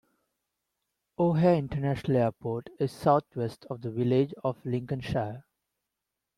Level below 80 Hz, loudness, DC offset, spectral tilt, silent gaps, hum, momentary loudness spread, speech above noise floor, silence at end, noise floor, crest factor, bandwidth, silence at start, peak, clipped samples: -58 dBFS; -29 LUFS; under 0.1%; -8.5 dB/octave; none; none; 11 LU; 58 dB; 1 s; -86 dBFS; 20 dB; 13 kHz; 1.2 s; -10 dBFS; under 0.1%